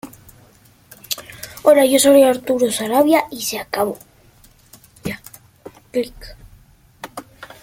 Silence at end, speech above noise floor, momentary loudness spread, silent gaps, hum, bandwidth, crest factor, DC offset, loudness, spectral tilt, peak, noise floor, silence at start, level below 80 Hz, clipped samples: 0.2 s; 35 dB; 23 LU; none; none; 17 kHz; 18 dB; under 0.1%; -16 LUFS; -3 dB/octave; -2 dBFS; -50 dBFS; 0.05 s; -50 dBFS; under 0.1%